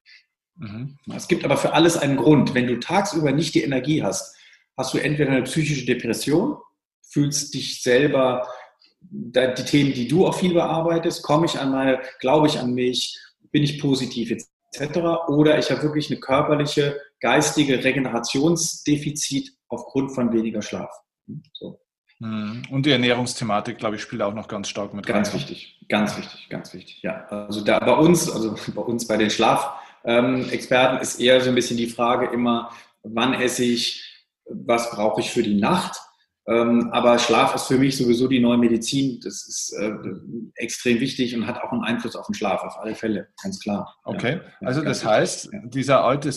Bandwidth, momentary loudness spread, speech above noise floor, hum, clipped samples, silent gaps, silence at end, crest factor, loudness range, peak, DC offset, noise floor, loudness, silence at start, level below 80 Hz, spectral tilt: 13 kHz; 15 LU; 33 dB; none; under 0.1%; 6.85-7.02 s, 14.53-14.60 s, 21.98-22.04 s; 0 s; 20 dB; 6 LU; -2 dBFS; under 0.1%; -54 dBFS; -21 LUFS; 0.6 s; -56 dBFS; -4.5 dB/octave